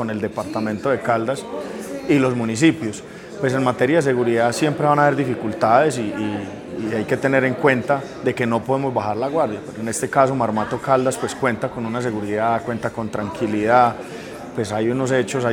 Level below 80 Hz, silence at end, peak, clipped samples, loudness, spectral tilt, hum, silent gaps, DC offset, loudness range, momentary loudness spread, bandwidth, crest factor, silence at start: -54 dBFS; 0 s; 0 dBFS; under 0.1%; -20 LUFS; -5.5 dB/octave; none; none; under 0.1%; 3 LU; 11 LU; 17 kHz; 20 dB; 0 s